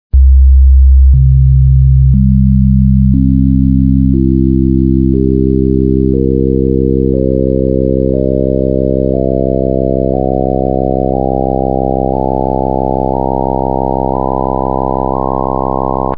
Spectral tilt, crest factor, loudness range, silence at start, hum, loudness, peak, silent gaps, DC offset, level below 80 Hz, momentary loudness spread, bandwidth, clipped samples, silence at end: -15 dB/octave; 10 dB; 5 LU; 0.1 s; none; -11 LUFS; 0 dBFS; none; 5%; -14 dBFS; 6 LU; 1.2 kHz; under 0.1%; 0 s